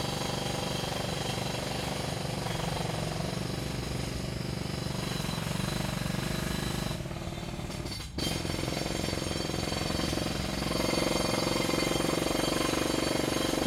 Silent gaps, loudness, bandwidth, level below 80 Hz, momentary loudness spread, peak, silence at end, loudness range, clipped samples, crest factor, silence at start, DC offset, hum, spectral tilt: none; -32 LUFS; 16.5 kHz; -44 dBFS; 6 LU; -16 dBFS; 0 s; 5 LU; under 0.1%; 16 dB; 0 s; under 0.1%; none; -4.5 dB/octave